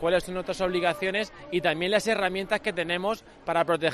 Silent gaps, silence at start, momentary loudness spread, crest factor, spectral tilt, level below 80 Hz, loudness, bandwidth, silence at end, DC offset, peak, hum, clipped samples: none; 0 s; 6 LU; 18 dB; -4.5 dB/octave; -54 dBFS; -27 LUFS; 13.5 kHz; 0 s; under 0.1%; -8 dBFS; none; under 0.1%